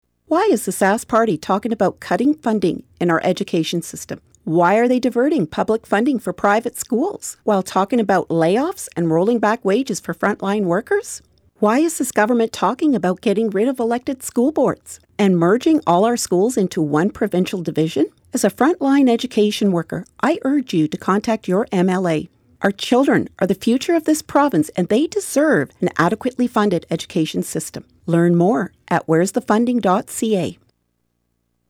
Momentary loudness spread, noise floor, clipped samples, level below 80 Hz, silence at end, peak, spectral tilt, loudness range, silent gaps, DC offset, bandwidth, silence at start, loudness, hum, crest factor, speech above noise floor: 7 LU; -69 dBFS; under 0.1%; -56 dBFS; 1.15 s; -4 dBFS; -5.5 dB/octave; 2 LU; none; under 0.1%; 17.5 kHz; 0.3 s; -18 LUFS; none; 14 dB; 52 dB